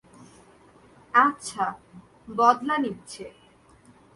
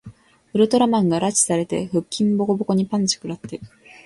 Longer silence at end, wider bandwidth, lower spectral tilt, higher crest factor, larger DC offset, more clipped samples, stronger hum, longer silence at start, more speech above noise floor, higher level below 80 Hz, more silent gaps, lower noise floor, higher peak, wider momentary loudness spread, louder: first, 0.85 s vs 0.4 s; about the same, 11.5 kHz vs 11.5 kHz; about the same, -4 dB/octave vs -5 dB/octave; first, 22 dB vs 16 dB; neither; neither; neither; first, 1.15 s vs 0.05 s; first, 31 dB vs 25 dB; second, -66 dBFS vs -58 dBFS; neither; first, -55 dBFS vs -45 dBFS; about the same, -6 dBFS vs -4 dBFS; first, 20 LU vs 13 LU; second, -24 LUFS vs -20 LUFS